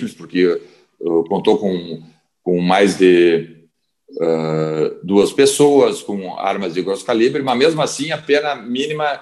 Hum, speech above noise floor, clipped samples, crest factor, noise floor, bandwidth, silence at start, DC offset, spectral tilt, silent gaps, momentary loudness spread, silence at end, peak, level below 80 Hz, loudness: none; 41 dB; under 0.1%; 16 dB; -57 dBFS; 12.5 kHz; 0 s; under 0.1%; -5 dB/octave; none; 13 LU; 0 s; 0 dBFS; -62 dBFS; -16 LUFS